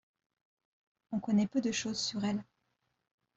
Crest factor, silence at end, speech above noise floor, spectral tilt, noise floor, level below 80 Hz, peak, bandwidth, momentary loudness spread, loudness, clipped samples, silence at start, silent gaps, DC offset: 18 dB; 0.95 s; 48 dB; -4.5 dB/octave; -81 dBFS; -72 dBFS; -20 dBFS; 8 kHz; 9 LU; -34 LUFS; under 0.1%; 1.1 s; none; under 0.1%